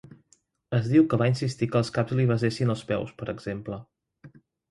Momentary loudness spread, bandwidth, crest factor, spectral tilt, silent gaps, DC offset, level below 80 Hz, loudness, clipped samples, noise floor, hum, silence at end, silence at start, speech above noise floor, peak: 13 LU; 11.5 kHz; 18 dB; -7.5 dB/octave; none; under 0.1%; -58 dBFS; -26 LUFS; under 0.1%; -66 dBFS; none; 0.45 s; 0.7 s; 41 dB; -8 dBFS